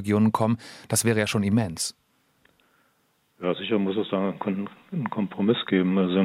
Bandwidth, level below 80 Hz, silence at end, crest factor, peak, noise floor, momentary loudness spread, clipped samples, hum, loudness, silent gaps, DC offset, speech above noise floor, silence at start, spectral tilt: 15.5 kHz; -68 dBFS; 0 s; 18 dB; -8 dBFS; -68 dBFS; 9 LU; under 0.1%; none; -25 LUFS; none; under 0.1%; 44 dB; 0 s; -5 dB/octave